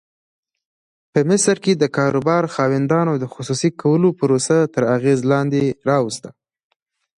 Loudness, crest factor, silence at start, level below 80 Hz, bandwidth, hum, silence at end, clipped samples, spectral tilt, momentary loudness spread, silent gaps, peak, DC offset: -18 LUFS; 16 dB; 1.15 s; -60 dBFS; 11.5 kHz; none; 0.9 s; under 0.1%; -5.5 dB/octave; 5 LU; none; -4 dBFS; under 0.1%